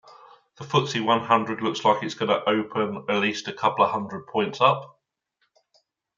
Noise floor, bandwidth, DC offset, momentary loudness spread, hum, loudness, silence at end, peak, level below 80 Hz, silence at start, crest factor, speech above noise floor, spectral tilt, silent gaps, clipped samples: -74 dBFS; 7.6 kHz; under 0.1%; 7 LU; none; -24 LUFS; 1.3 s; -4 dBFS; -72 dBFS; 0.1 s; 22 dB; 50 dB; -5 dB/octave; none; under 0.1%